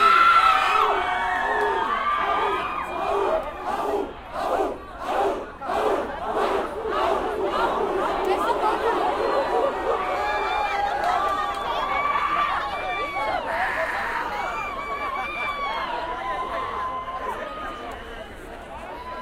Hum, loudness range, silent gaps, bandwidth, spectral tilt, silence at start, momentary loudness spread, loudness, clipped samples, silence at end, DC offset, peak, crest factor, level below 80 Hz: none; 5 LU; none; 16 kHz; -4 dB/octave; 0 s; 8 LU; -24 LUFS; under 0.1%; 0 s; under 0.1%; -6 dBFS; 18 dB; -46 dBFS